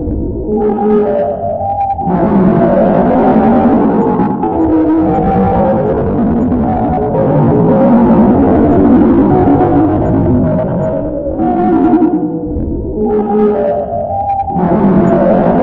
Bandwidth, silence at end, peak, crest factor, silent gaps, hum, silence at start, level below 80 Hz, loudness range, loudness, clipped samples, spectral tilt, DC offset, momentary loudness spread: 4.1 kHz; 0 s; 0 dBFS; 10 dB; none; none; 0 s; -28 dBFS; 4 LU; -11 LUFS; under 0.1%; -12 dB/octave; under 0.1%; 8 LU